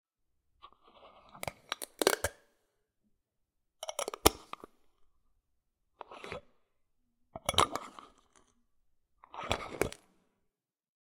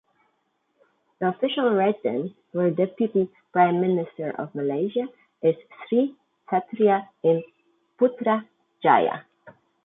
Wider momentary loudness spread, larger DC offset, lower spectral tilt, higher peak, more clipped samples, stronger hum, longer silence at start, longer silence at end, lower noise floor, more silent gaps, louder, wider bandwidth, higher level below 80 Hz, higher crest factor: first, 22 LU vs 10 LU; neither; second, -2.5 dB/octave vs -10.5 dB/octave; first, 0 dBFS vs -4 dBFS; neither; neither; second, 0.65 s vs 1.2 s; first, 1.05 s vs 0.35 s; first, -83 dBFS vs -72 dBFS; neither; second, -34 LUFS vs -24 LUFS; first, 17 kHz vs 4 kHz; first, -56 dBFS vs -74 dBFS; first, 38 dB vs 20 dB